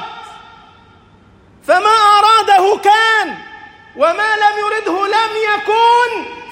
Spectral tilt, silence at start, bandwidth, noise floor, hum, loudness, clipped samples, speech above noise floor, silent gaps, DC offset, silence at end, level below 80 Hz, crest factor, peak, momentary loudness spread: -1.5 dB/octave; 0 s; 16.5 kHz; -46 dBFS; none; -12 LUFS; under 0.1%; 32 dB; none; under 0.1%; 0 s; -58 dBFS; 14 dB; 0 dBFS; 14 LU